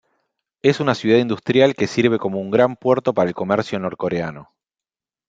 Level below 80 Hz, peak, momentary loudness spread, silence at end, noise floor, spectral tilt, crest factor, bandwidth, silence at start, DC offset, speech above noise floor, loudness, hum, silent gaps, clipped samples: -60 dBFS; 0 dBFS; 7 LU; 0.85 s; under -90 dBFS; -6.5 dB/octave; 18 dB; 7.8 kHz; 0.65 s; under 0.1%; over 72 dB; -19 LUFS; none; none; under 0.1%